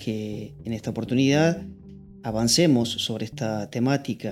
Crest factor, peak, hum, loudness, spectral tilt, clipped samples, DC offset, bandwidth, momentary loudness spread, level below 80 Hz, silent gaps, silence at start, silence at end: 16 dB; -8 dBFS; none; -24 LUFS; -5 dB/octave; under 0.1%; under 0.1%; 15.5 kHz; 14 LU; -54 dBFS; none; 0 s; 0 s